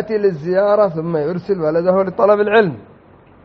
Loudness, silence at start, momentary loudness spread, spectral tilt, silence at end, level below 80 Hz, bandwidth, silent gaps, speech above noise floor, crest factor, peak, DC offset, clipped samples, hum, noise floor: -16 LUFS; 0 s; 7 LU; -5.5 dB/octave; 0.6 s; -56 dBFS; 6 kHz; none; 30 dB; 16 dB; 0 dBFS; under 0.1%; under 0.1%; none; -46 dBFS